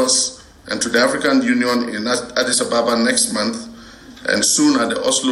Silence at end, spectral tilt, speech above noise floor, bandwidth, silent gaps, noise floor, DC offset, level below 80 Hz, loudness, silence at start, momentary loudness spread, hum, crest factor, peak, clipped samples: 0 s; -2 dB/octave; 22 dB; 15.5 kHz; none; -39 dBFS; under 0.1%; -52 dBFS; -17 LUFS; 0 s; 8 LU; none; 14 dB; -4 dBFS; under 0.1%